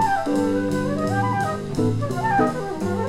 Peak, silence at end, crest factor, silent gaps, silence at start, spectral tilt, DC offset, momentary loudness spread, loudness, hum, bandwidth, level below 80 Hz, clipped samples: -6 dBFS; 0 s; 16 dB; none; 0 s; -7 dB/octave; under 0.1%; 4 LU; -22 LUFS; none; 15.5 kHz; -46 dBFS; under 0.1%